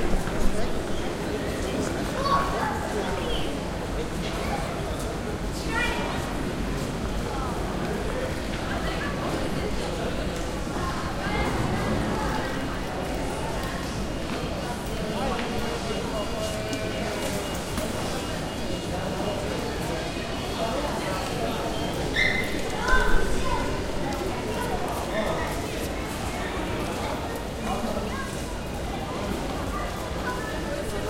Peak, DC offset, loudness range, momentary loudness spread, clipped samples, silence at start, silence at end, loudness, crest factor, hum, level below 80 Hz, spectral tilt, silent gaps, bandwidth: -6 dBFS; under 0.1%; 3 LU; 4 LU; under 0.1%; 0 s; 0 s; -29 LUFS; 22 dB; none; -34 dBFS; -5 dB/octave; none; 16 kHz